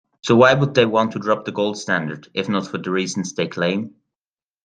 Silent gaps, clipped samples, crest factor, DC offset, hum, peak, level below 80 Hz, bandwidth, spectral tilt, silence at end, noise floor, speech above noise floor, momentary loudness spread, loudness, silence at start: none; under 0.1%; 20 dB; under 0.1%; none; 0 dBFS; -60 dBFS; 9.6 kHz; -5 dB/octave; 0.75 s; under -90 dBFS; over 71 dB; 11 LU; -19 LUFS; 0.25 s